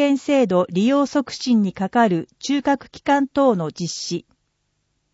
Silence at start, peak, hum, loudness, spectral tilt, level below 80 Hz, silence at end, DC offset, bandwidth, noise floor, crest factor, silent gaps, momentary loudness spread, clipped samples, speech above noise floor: 0 s; -6 dBFS; none; -20 LUFS; -5.5 dB/octave; -60 dBFS; 0.9 s; under 0.1%; 8 kHz; -71 dBFS; 14 dB; none; 8 LU; under 0.1%; 51 dB